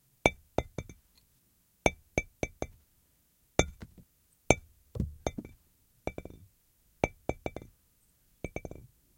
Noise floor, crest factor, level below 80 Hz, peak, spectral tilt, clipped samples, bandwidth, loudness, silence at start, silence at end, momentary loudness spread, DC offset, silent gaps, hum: -70 dBFS; 34 dB; -48 dBFS; -2 dBFS; -4.5 dB/octave; under 0.1%; 16.5 kHz; -35 LUFS; 0.25 s; 0.45 s; 20 LU; under 0.1%; none; none